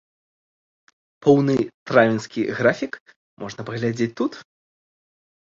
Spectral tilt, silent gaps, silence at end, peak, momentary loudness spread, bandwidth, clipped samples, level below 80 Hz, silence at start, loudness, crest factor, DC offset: -6.5 dB/octave; 1.74-1.86 s, 3.00-3.06 s, 3.16-3.37 s; 1.15 s; -2 dBFS; 17 LU; 7.6 kHz; under 0.1%; -62 dBFS; 1.25 s; -21 LUFS; 22 dB; under 0.1%